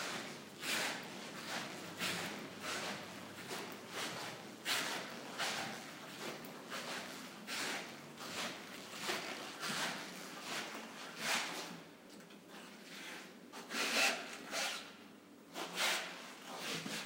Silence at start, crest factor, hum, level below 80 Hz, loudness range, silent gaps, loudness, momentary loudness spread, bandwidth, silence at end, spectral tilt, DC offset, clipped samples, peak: 0 s; 24 dB; none; -88 dBFS; 5 LU; none; -41 LUFS; 14 LU; 16 kHz; 0 s; -1.5 dB/octave; under 0.1%; under 0.1%; -20 dBFS